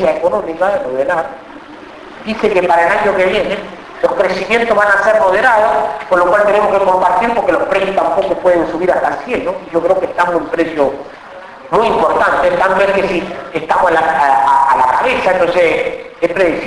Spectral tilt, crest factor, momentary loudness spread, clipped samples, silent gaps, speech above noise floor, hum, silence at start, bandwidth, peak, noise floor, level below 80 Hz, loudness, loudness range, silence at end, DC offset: -5 dB/octave; 12 dB; 12 LU; under 0.1%; none; 20 dB; none; 0 s; 11 kHz; 0 dBFS; -33 dBFS; -44 dBFS; -13 LUFS; 4 LU; 0 s; under 0.1%